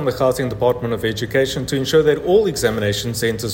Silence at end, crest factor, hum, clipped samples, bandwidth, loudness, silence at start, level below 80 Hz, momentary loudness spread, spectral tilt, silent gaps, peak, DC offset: 0 s; 14 dB; none; under 0.1%; 16.5 kHz; -18 LUFS; 0 s; -42 dBFS; 5 LU; -5 dB/octave; none; -4 dBFS; under 0.1%